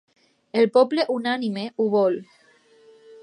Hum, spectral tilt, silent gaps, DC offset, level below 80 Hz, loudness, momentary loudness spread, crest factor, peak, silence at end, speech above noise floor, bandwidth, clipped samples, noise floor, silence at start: none; -6.5 dB/octave; none; under 0.1%; -78 dBFS; -22 LUFS; 10 LU; 18 dB; -4 dBFS; 0.05 s; 35 dB; 10.5 kHz; under 0.1%; -56 dBFS; 0.55 s